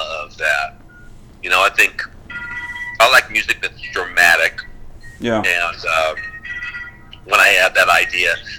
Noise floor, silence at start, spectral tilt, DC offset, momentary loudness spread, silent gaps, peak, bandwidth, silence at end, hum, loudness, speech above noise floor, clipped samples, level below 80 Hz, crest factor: -39 dBFS; 0 s; -1.5 dB/octave; under 0.1%; 17 LU; none; 0 dBFS; 19.5 kHz; 0 s; none; -14 LUFS; 24 dB; under 0.1%; -42 dBFS; 18 dB